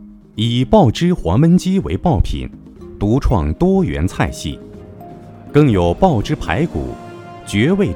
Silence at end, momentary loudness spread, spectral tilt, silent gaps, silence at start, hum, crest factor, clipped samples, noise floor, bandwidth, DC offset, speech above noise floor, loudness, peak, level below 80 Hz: 0 s; 22 LU; -7 dB/octave; none; 0 s; none; 16 dB; under 0.1%; -35 dBFS; 14 kHz; under 0.1%; 21 dB; -16 LUFS; 0 dBFS; -28 dBFS